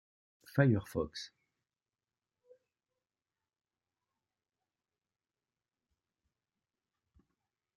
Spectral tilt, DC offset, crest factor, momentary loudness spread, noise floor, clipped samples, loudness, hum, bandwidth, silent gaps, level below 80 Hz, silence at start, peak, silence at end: -7.5 dB/octave; under 0.1%; 26 dB; 17 LU; under -90 dBFS; under 0.1%; -33 LUFS; none; 12 kHz; none; -70 dBFS; 0.55 s; -14 dBFS; 6.5 s